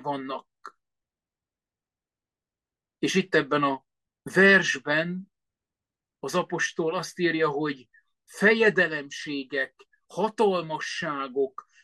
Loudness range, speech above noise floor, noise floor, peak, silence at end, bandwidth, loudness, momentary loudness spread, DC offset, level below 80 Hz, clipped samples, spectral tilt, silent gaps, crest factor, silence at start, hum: 6 LU; over 65 dB; under -90 dBFS; -8 dBFS; 0.25 s; 12.5 kHz; -25 LUFS; 14 LU; under 0.1%; -74 dBFS; under 0.1%; -4.5 dB/octave; none; 20 dB; 0 s; none